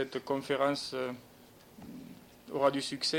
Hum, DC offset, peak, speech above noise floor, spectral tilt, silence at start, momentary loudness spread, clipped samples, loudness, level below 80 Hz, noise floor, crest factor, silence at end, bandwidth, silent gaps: none; under 0.1%; -14 dBFS; 25 dB; -4 dB/octave; 0 s; 21 LU; under 0.1%; -33 LUFS; -70 dBFS; -57 dBFS; 20 dB; 0 s; 17 kHz; none